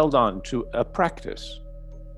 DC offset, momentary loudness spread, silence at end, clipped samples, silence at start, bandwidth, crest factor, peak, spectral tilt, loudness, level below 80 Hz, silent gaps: under 0.1%; 20 LU; 0 s; under 0.1%; 0 s; 11.5 kHz; 18 dB; -6 dBFS; -6 dB/octave; -25 LUFS; -40 dBFS; none